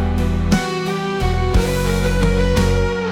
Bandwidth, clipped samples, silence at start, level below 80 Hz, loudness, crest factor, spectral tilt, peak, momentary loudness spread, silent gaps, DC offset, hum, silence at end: 16.5 kHz; under 0.1%; 0 s; -22 dBFS; -18 LUFS; 12 dB; -6 dB/octave; -4 dBFS; 4 LU; none; under 0.1%; none; 0 s